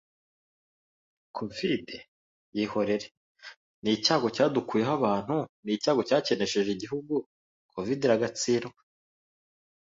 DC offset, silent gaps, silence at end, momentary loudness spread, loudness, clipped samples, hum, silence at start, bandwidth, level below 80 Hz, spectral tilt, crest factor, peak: under 0.1%; 2.08-2.52 s, 3.11-3.35 s, 3.57-3.82 s, 5.49-5.63 s, 7.26-7.69 s; 1.2 s; 18 LU; -28 LUFS; under 0.1%; none; 1.35 s; 8 kHz; -68 dBFS; -4.5 dB/octave; 20 dB; -10 dBFS